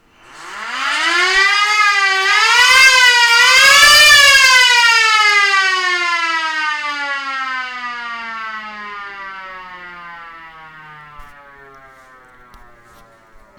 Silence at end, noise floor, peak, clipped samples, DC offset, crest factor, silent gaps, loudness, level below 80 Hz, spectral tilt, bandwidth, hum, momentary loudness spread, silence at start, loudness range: 2.35 s; -45 dBFS; -2 dBFS; under 0.1%; under 0.1%; 14 dB; none; -9 LUFS; -48 dBFS; 2 dB/octave; over 20 kHz; none; 23 LU; 0.4 s; 21 LU